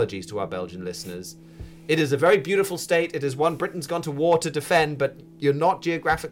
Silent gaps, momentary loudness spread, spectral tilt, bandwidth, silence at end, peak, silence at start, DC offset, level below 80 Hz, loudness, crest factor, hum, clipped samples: none; 14 LU; -5 dB/octave; 17 kHz; 0 s; -10 dBFS; 0 s; under 0.1%; -52 dBFS; -24 LUFS; 14 dB; none; under 0.1%